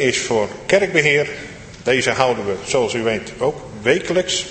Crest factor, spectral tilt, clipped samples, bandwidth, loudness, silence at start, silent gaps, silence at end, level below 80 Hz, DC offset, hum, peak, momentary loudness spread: 18 dB; -3.5 dB/octave; under 0.1%; 8.8 kHz; -18 LUFS; 0 s; none; 0 s; -48 dBFS; under 0.1%; none; 0 dBFS; 8 LU